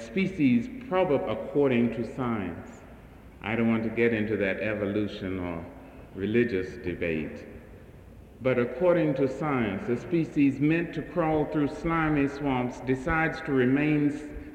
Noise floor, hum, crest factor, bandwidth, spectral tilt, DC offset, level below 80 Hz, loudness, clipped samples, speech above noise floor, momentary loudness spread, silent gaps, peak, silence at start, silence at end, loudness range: -48 dBFS; none; 16 dB; 9.2 kHz; -8 dB/octave; under 0.1%; -50 dBFS; -27 LUFS; under 0.1%; 22 dB; 11 LU; none; -12 dBFS; 0 s; 0 s; 4 LU